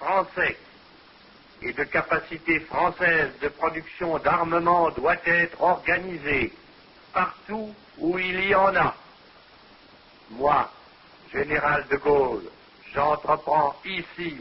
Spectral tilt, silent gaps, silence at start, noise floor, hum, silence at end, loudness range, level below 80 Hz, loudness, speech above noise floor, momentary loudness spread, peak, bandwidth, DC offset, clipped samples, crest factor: -9.5 dB/octave; none; 0 s; -52 dBFS; none; 0 s; 3 LU; -52 dBFS; -24 LUFS; 28 dB; 13 LU; -6 dBFS; 5.8 kHz; under 0.1%; under 0.1%; 18 dB